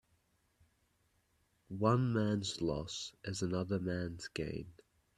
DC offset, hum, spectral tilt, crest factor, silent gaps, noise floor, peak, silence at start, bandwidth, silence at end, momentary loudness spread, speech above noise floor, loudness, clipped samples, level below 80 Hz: under 0.1%; none; -6 dB/octave; 22 dB; none; -76 dBFS; -16 dBFS; 1.7 s; 12 kHz; 0.45 s; 11 LU; 40 dB; -37 LUFS; under 0.1%; -62 dBFS